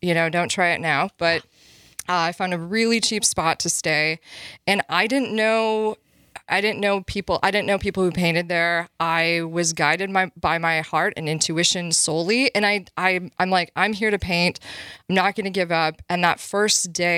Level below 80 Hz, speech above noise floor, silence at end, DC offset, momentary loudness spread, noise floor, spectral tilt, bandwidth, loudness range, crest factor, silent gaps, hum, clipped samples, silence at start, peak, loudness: -52 dBFS; 20 dB; 0 s; under 0.1%; 5 LU; -41 dBFS; -3 dB/octave; 16 kHz; 2 LU; 20 dB; none; none; under 0.1%; 0.05 s; -2 dBFS; -21 LUFS